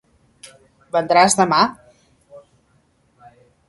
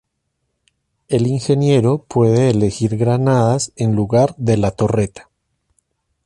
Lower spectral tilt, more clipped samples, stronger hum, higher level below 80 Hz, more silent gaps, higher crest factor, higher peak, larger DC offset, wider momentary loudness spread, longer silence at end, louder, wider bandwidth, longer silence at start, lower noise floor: second, -3 dB/octave vs -7 dB/octave; neither; neither; second, -60 dBFS vs -44 dBFS; neither; first, 22 dB vs 14 dB; about the same, 0 dBFS vs -2 dBFS; neither; first, 9 LU vs 5 LU; first, 1.3 s vs 1.05 s; about the same, -16 LUFS vs -16 LUFS; about the same, 11.5 kHz vs 11.5 kHz; second, 0.45 s vs 1.1 s; second, -60 dBFS vs -72 dBFS